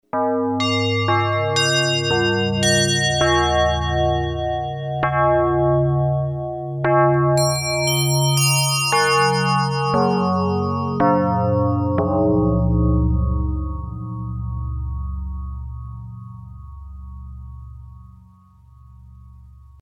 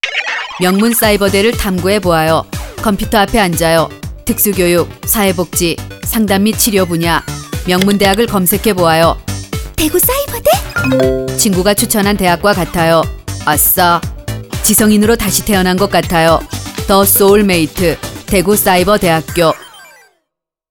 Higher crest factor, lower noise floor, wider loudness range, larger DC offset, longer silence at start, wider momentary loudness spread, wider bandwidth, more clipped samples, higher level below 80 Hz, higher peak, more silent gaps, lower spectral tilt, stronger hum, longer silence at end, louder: about the same, 14 dB vs 12 dB; second, -48 dBFS vs -75 dBFS; first, 15 LU vs 2 LU; neither; about the same, 0.15 s vs 0.05 s; first, 19 LU vs 9 LU; second, 17.5 kHz vs over 20 kHz; neither; about the same, -32 dBFS vs -30 dBFS; second, -6 dBFS vs 0 dBFS; neither; about the same, -4.5 dB/octave vs -4 dB/octave; neither; second, 0.3 s vs 0.85 s; second, -19 LUFS vs -11 LUFS